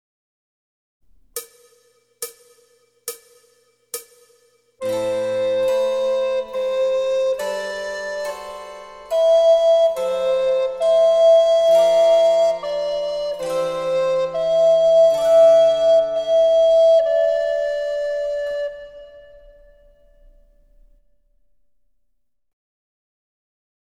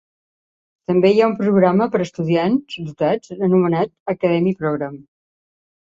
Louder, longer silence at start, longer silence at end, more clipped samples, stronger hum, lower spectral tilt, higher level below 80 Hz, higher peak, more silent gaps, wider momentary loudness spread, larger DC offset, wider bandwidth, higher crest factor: about the same, -17 LUFS vs -18 LUFS; first, 1.35 s vs 0.9 s; first, 4.8 s vs 0.85 s; neither; neither; second, -2.5 dB/octave vs -8 dB/octave; about the same, -56 dBFS vs -60 dBFS; second, -6 dBFS vs -2 dBFS; second, none vs 4.00-4.06 s; first, 19 LU vs 8 LU; neither; first, 16 kHz vs 7.6 kHz; about the same, 14 dB vs 16 dB